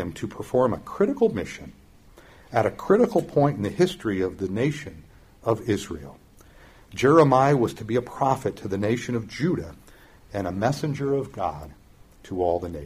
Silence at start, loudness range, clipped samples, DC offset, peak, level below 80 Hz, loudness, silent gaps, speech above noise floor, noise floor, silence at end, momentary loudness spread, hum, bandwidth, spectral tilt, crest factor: 0 s; 6 LU; under 0.1%; under 0.1%; -4 dBFS; -52 dBFS; -24 LUFS; none; 27 dB; -51 dBFS; 0 s; 16 LU; none; 15.5 kHz; -7 dB/octave; 20 dB